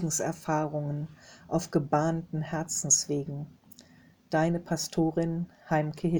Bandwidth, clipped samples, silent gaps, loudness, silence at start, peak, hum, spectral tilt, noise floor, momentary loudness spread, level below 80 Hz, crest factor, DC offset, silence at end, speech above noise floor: over 20 kHz; under 0.1%; none; -29 LUFS; 0 s; -10 dBFS; none; -4.5 dB/octave; -58 dBFS; 12 LU; -58 dBFS; 20 dB; under 0.1%; 0 s; 29 dB